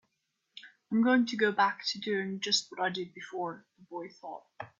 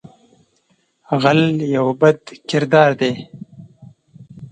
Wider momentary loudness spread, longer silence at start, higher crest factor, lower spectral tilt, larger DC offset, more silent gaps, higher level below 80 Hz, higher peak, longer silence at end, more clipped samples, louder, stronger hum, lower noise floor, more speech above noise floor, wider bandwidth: first, 19 LU vs 14 LU; second, 0.55 s vs 1.1 s; about the same, 20 dB vs 18 dB; second, -3.5 dB/octave vs -6.5 dB/octave; neither; neither; second, -80 dBFS vs -62 dBFS; second, -14 dBFS vs 0 dBFS; about the same, 0.15 s vs 0.05 s; neither; second, -30 LUFS vs -16 LUFS; neither; first, -81 dBFS vs -62 dBFS; about the same, 49 dB vs 47 dB; second, 7.8 kHz vs 9.2 kHz